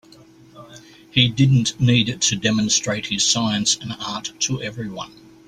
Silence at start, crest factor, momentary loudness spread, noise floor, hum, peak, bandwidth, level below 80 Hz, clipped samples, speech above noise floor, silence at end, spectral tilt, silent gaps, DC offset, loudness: 0.55 s; 20 dB; 12 LU; -48 dBFS; none; -2 dBFS; 12 kHz; -52 dBFS; under 0.1%; 28 dB; 0.4 s; -3.5 dB/octave; none; under 0.1%; -19 LUFS